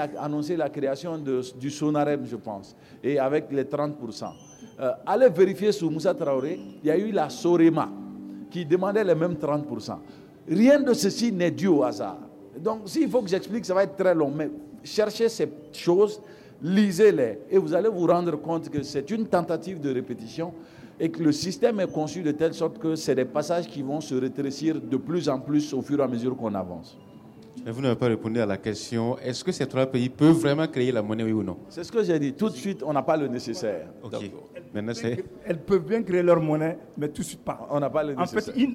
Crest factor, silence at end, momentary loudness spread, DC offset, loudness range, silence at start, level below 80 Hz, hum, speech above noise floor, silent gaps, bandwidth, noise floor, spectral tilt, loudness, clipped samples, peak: 16 dB; 0 s; 14 LU; under 0.1%; 5 LU; 0 s; -64 dBFS; none; 22 dB; none; 15.5 kHz; -47 dBFS; -6 dB/octave; -25 LUFS; under 0.1%; -10 dBFS